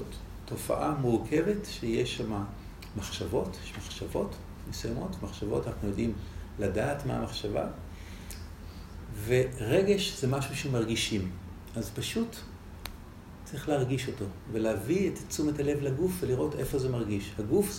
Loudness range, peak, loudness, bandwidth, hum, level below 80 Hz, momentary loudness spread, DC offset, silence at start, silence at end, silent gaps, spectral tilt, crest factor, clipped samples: 5 LU; -14 dBFS; -32 LUFS; 16 kHz; none; -48 dBFS; 15 LU; under 0.1%; 0 s; 0 s; none; -5.5 dB/octave; 18 dB; under 0.1%